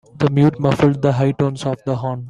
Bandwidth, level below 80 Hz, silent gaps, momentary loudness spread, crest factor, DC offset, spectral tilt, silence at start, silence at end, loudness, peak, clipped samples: 10.5 kHz; -48 dBFS; none; 7 LU; 16 dB; under 0.1%; -8 dB/octave; 0.15 s; 0 s; -17 LUFS; -2 dBFS; under 0.1%